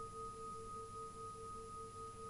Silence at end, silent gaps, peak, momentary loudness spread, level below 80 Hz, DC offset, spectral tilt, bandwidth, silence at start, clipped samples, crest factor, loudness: 0 s; none; -38 dBFS; 2 LU; -64 dBFS; under 0.1%; -4.5 dB/octave; 11.5 kHz; 0 s; under 0.1%; 12 dB; -50 LUFS